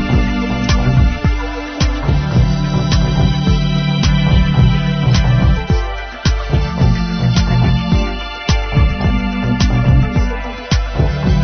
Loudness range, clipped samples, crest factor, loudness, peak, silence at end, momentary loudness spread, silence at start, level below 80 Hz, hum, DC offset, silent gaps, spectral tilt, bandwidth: 2 LU; under 0.1%; 12 dB; -15 LUFS; -2 dBFS; 0 s; 6 LU; 0 s; -18 dBFS; none; under 0.1%; none; -6.5 dB/octave; 6.6 kHz